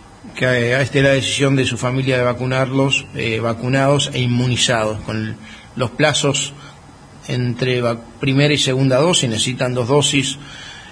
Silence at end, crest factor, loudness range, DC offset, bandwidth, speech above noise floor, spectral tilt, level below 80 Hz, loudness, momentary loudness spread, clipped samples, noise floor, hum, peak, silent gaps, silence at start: 0 s; 16 dB; 3 LU; under 0.1%; 10.5 kHz; 24 dB; -4.5 dB/octave; -46 dBFS; -17 LUFS; 10 LU; under 0.1%; -41 dBFS; none; -2 dBFS; none; 0.25 s